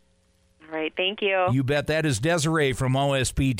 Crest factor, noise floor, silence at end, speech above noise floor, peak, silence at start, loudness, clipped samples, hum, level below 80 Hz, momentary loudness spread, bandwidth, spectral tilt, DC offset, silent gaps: 12 dB; -64 dBFS; 0 s; 40 dB; -14 dBFS; 0.7 s; -24 LUFS; under 0.1%; none; -42 dBFS; 5 LU; 16 kHz; -5 dB/octave; under 0.1%; none